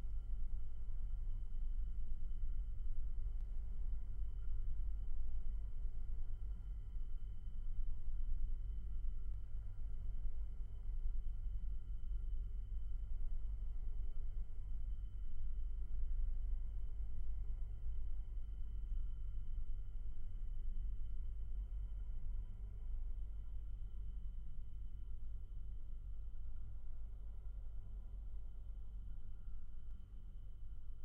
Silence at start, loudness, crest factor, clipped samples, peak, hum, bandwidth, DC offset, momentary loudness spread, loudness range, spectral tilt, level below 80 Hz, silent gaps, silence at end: 0 s; -50 LUFS; 12 dB; under 0.1%; -28 dBFS; none; 1.5 kHz; under 0.1%; 6 LU; 5 LU; -8.5 dB/octave; -42 dBFS; none; 0 s